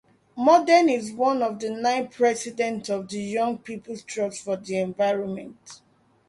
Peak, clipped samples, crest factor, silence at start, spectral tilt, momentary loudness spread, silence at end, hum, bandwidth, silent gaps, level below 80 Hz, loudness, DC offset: -4 dBFS; under 0.1%; 20 dB; 0.35 s; -4.5 dB/octave; 16 LU; 0.55 s; none; 11.5 kHz; none; -70 dBFS; -24 LUFS; under 0.1%